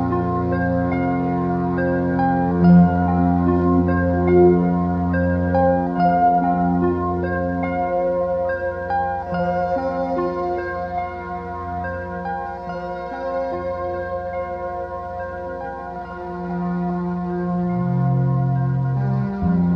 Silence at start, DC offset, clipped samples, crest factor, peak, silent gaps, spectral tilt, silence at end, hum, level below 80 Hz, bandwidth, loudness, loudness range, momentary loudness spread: 0 s; under 0.1%; under 0.1%; 16 dB; -4 dBFS; none; -11 dB/octave; 0 s; none; -40 dBFS; 5.4 kHz; -21 LUFS; 10 LU; 12 LU